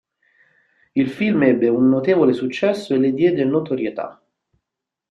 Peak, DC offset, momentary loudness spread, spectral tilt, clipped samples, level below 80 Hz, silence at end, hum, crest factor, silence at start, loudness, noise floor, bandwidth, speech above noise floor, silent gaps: -2 dBFS; under 0.1%; 9 LU; -7.5 dB/octave; under 0.1%; -62 dBFS; 1 s; none; 18 dB; 0.95 s; -18 LUFS; -84 dBFS; 9.6 kHz; 66 dB; none